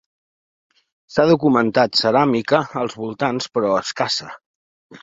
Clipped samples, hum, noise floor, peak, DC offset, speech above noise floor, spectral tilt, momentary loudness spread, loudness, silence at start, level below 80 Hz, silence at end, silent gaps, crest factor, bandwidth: under 0.1%; none; under -90 dBFS; -2 dBFS; under 0.1%; over 72 dB; -5 dB/octave; 9 LU; -18 LUFS; 1.1 s; -60 dBFS; 0.05 s; 4.46-4.90 s; 18 dB; 8 kHz